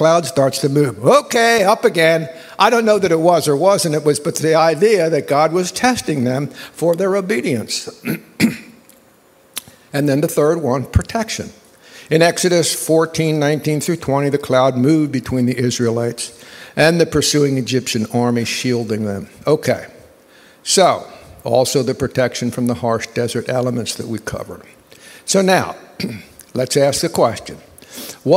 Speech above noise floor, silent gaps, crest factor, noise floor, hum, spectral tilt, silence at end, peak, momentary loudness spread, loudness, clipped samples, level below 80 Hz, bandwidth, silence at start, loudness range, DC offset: 35 dB; none; 16 dB; -50 dBFS; none; -4.5 dB/octave; 0 s; 0 dBFS; 14 LU; -16 LUFS; under 0.1%; -44 dBFS; 16 kHz; 0 s; 6 LU; under 0.1%